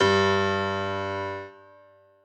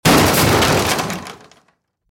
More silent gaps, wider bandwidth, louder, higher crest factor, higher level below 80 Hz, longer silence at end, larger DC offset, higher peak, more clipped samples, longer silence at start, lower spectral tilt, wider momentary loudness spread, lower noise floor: neither; second, 8.6 kHz vs 17 kHz; second, -25 LUFS vs -14 LUFS; about the same, 18 dB vs 16 dB; second, -74 dBFS vs -36 dBFS; about the same, 0.7 s vs 0.75 s; neither; second, -10 dBFS vs 0 dBFS; neither; about the same, 0 s vs 0.05 s; about the same, -5 dB/octave vs -4 dB/octave; about the same, 15 LU vs 16 LU; second, -55 dBFS vs -62 dBFS